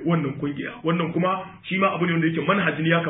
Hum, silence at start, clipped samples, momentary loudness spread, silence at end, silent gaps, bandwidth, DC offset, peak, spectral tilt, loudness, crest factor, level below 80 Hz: none; 0 s; under 0.1%; 7 LU; 0 s; none; 4 kHz; under 0.1%; -8 dBFS; -11.5 dB/octave; -23 LUFS; 16 dB; -62 dBFS